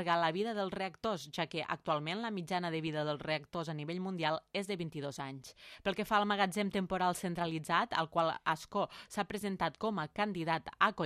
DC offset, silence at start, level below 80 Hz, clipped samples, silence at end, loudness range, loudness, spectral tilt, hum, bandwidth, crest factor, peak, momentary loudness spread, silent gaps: under 0.1%; 0 s; -68 dBFS; under 0.1%; 0 s; 4 LU; -36 LUFS; -5 dB/octave; none; 15 kHz; 24 dB; -12 dBFS; 8 LU; none